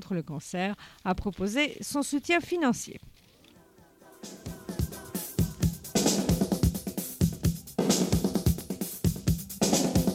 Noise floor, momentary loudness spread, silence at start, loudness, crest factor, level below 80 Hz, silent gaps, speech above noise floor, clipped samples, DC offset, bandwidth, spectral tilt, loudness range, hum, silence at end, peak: -57 dBFS; 11 LU; 0 s; -29 LUFS; 18 dB; -42 dBFS; none; 27 dB; under 0.1%; under 0.1%; 17 kHz; -5 dB/octave; 5 LU; none; 0 s; -12 dBFS